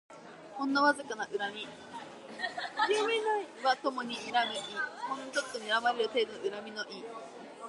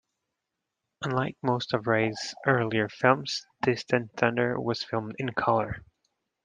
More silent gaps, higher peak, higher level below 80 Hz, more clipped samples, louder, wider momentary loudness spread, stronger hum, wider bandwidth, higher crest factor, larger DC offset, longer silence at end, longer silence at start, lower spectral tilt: neither; second, -14 dBFS vs -6 dBFS; second, -82 dBFS vs -62 dBFS; neither; second, -33 LUFS vs -28 LUFS; first, 17 LU vs 7 LU; neither; first, 11.5 kHz vs 9.8 kHz; about the same, 20 dB vs 24 dB; neither; second, 0 s vs 0.65 s; second, 0.1 s vs 1 s; second, -2.5 dB/octave vs -5.5 dB/octave